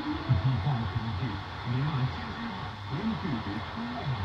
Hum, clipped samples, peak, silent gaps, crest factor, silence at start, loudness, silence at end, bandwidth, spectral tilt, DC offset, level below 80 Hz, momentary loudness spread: none; under 0.1%; -14 dBFS; none; 16 dB; 0 s; -32 LUFS; 0 s; 7 kHz; -7.5 dB/octave; under 0.1%; -50 dBFS; 8 LU